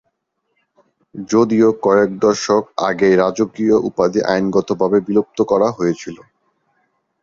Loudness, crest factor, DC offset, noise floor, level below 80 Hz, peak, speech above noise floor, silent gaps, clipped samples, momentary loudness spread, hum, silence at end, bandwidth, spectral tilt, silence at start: -16 LUFS; 16 dB; under 0.1%; -70 dBFS; -54 dBFS; -2 dBFS; 55 dB; none; under 0.1%; 7 LU; none; 1.1 s; 7.6 kHz; -6 dB/octave; 1.15 s